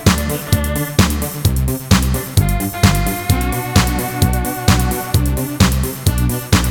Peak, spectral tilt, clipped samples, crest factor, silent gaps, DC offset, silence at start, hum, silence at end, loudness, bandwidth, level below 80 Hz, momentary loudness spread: 0 dBFS; -5 dB/octave; under 0.1%; 16 dB; none; under 0.1%; 0 s; none; 0 s; -16 LUFS; 20 kHz; -22 dBFS; 3 LU